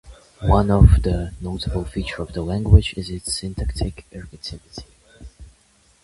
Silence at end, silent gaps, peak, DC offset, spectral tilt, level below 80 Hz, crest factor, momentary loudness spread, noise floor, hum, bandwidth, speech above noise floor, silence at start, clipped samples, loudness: 0.6 s; none; 0 dBFS; under 0.1%; -6.5 dB/octave; -24 dBFS; 20 dB; 21 LU; -57 dBFS; none; 11.5 kHz; 38 dB; 0.05 s; under 0.1%; -20 LUFS